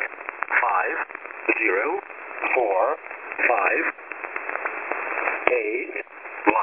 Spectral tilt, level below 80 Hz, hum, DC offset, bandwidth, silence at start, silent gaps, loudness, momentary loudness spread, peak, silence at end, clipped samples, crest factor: -7 dB/octave; -68 dBFS; none; under 0.1%; 3.6 kHz; 0 s; none; -24 LUFS; 11 LU; 0 dBFS; 0 s; under 0.1%; 24 dB